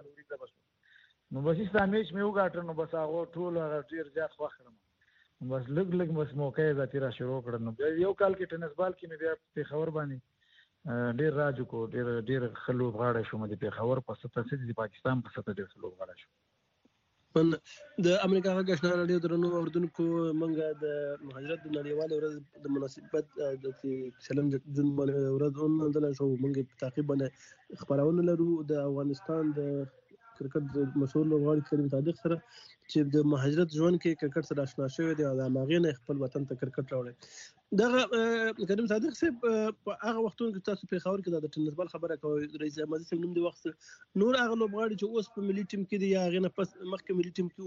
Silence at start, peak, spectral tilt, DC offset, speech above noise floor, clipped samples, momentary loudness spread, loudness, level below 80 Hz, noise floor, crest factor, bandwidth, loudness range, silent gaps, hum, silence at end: 0.05 s; -12 dBFS; -6 dB/octave; under 0.1%; 41 dB; under 0.1%; 10 LU; -32 LUFS; -70 dBFS; -72 dBFS; 20 dB; 7.6 kHz; 5 LU; none; none; 0 s